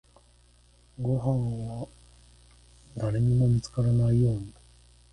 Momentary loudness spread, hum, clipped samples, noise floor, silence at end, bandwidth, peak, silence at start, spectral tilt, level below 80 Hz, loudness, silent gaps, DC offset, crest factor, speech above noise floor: 17 LU; 60 Hz at -40 dBFS; under 0.1%; -59 dBFS; 0.6 s; 10.5 kHz; -14 dBFS; 1 s; -8.5 dB/octave; -48 dBFS; -27 LUFS; none; under 0.1%; 14 dB; 34 dB